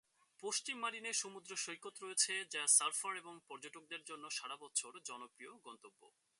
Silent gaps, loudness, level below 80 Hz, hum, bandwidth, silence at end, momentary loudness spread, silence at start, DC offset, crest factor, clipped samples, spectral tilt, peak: none; -38 LUFS; under -90 dBFS; none; 12 kHz; 0.3 s; 23 LU; 0.4 s; under 0.1%; 26 dB; under 0.1%; 1 dB/octave; -18 dBFS